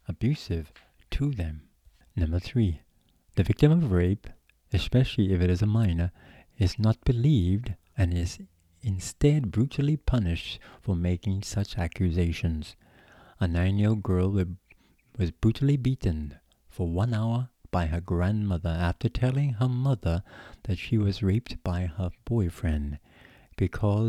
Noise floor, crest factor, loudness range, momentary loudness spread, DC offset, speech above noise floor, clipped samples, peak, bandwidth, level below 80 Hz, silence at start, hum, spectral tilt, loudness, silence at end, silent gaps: -63 dBFS; 20 dB; 4 LU; 11 LU; under 0.1%; 37 dB; under 0.1%; -6 dBFS; 12.5 kHz; -40 dBFS; 0.1 s; none; -7.5 dB/octave; -28 LUFS; 0 s; none